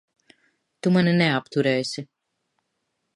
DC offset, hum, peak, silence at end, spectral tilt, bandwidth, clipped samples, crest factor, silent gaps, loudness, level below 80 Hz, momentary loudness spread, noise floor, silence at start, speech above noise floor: under 0.1%; none; -6 dBFS; 1.1 s; -6 dB/octave; 11.5 kHz; under 0.1%; 18 dB; none; -22 LUFS; -68 dBFS; 11 LU; -77 dBFS; 0.85 s; 55 dB